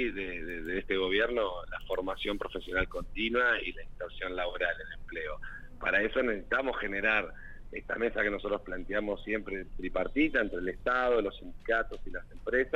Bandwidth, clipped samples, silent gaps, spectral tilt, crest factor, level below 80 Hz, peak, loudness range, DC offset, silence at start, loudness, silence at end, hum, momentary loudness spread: 8 kHz; under 0.1%; none; -6 dB/octave; 18 dB; -46 dBFS; -14 dBFS; 2 LU; under 0.1%; 0 s; -32 LUFS; 0 s; none; 13 LU